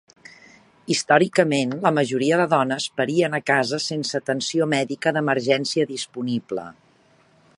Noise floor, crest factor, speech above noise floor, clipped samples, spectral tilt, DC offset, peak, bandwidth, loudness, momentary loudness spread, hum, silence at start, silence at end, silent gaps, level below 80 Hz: -58 dBFS; 22 dB; 36 dB; under 0.1%; -4.5 dB/octave; under 0.1%; -2 dBFS; 11.5 kHz; -21 LUFS; 8 LU; none; 0.9 s; 0.85 s; none; -70 dBFS